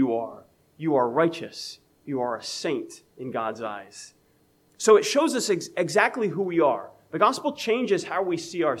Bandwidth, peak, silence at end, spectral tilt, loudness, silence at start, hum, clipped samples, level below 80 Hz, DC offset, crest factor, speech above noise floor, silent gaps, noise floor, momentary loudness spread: 14.5 kHz; -4 dBFS; 0 s; -4 dB/octave; -25 LUFS; 0 s; none; under 0.1%; -76 dBFS; under 0.1%; 20 dB; 38 dB; none; -63 dBFS; 16 LU